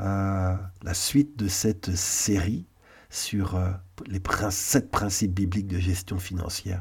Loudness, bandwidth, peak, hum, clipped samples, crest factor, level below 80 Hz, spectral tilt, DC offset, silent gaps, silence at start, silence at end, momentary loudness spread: -27 LUFS; 18 kHz; -8 dBFS; none; under 0.1%; 20 dB; -44 dBFS; -4.5 dB/octave; under 0.1%; none; 0 s; 0 s; 8 LU